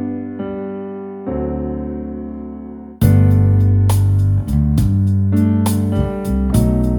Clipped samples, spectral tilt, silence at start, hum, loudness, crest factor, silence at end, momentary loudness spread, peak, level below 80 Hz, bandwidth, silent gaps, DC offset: under 0.1%; -8.5 dB/octave; 0 s; none; -16 LUFS; 16 dB; 0 s; 15 LU; 0 dBFS; -26 dBFS; 19 kHz; none; under 0.1%